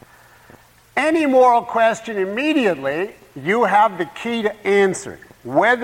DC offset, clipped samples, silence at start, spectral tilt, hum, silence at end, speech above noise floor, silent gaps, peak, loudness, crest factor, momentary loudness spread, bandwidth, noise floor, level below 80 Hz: under 0.1%; under 0.1%; 0.95 s; -4.5 dB/octave; none; 0 s; 31 dB; none; -4 dBFS; -18 LUFS; 14 dB; 12 LU; 16.5 kHz; -48 dBFS; -60 dBFS